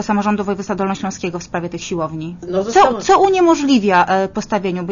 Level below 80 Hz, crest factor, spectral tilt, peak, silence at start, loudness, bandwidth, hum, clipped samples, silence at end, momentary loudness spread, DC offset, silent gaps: -46 dBFS; 14 dB; -5 dB/octave; -2 dBFS; 0 s; -16 LUFS; 7.4 kHz; none; under 0.1%; 0 s; 11 LU; under 0.1%; none